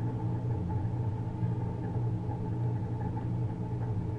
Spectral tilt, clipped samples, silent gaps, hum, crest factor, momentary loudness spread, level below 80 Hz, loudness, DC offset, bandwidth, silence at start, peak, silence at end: -10.5 dB/octave; under 0.1%; none; none; 12 dB; 2 LU; -48 dBFS; -34 LUFS; under 0.1%; 3.9 kHz; 0 s; -20 dBFS; 0 s